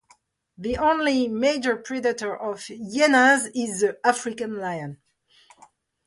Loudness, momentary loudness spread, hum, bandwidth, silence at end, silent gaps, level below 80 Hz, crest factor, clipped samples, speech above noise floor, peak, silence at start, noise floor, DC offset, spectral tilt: -23 LUFS; 14 LU; none; 11.5 kHz; 1.1 s; none; -56 dBFS; 20 dB; under 0.1%; 38 dB; -4 dBFS; 0.6 s; -61 dBFS; under 0.1%; -3.5 dB/octave